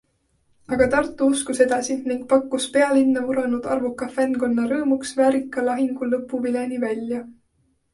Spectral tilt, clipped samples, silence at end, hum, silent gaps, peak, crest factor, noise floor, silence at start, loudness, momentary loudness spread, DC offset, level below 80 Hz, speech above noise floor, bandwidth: -4 dB/octave; under 0.1%; 0.6 s; none; none; -4 dBFS; 18 dB; -66 dBFS; 0.7 s; -22 LUFS; 7 LU; under 0.1%; -54 dBFS; 45 dB; 11.5 kHz